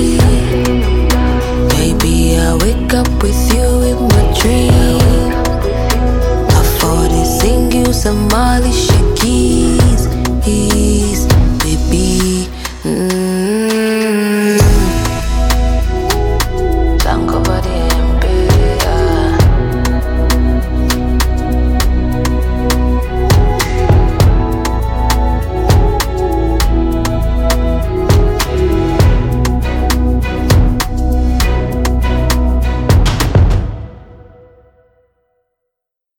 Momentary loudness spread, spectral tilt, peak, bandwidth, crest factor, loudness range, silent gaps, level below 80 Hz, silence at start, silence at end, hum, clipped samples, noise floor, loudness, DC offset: 4 LU; -5.5 dB/octave; 0 dBFS; 18.5 kHz; 12 dB; 2 LU; none; -14 dBFS; 0 s; 2.05 s; none; under 0.1%; -79 dBFS; -13 LUFS; under 0.1%